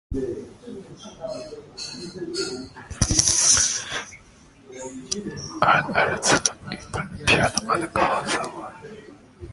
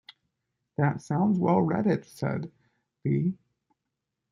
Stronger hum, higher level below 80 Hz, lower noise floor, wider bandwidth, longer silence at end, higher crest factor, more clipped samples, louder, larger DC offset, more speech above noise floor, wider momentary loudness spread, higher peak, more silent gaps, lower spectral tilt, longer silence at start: neither; first, -42 dBFS vs -66 dBFS; second, -51 dBFS vs -84 dBFS; about the same, 12 kHz vs 12 kHz; second, 0 s vs 0.95 s; first, 24 dB vs 18 dB; neither; first, -22 LUFS vs -27 LUFS; neither; second, 26 dB vs 58 dB; first, 21 LU vs 13 LU; first, 0 dBFS vs -10 dBFS; neither; second, -2 dB/octave vs -9 dB/octave; second, 0.1 s vs 0.8 s